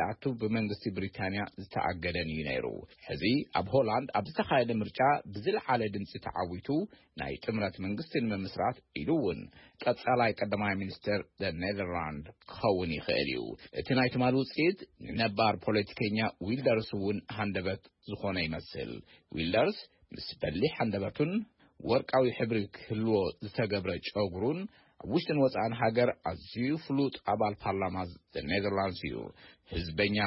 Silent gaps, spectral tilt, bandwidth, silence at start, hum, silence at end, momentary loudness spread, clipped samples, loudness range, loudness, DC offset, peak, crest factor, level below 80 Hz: none; -10 dB/octave; 5.8 kHz; 0 s; none; 0 s; 12 LU; under 0.1%; 4 LU; -32 LUFS; under 0.1%; -14 dBFS; 18 dB; -58 dBFS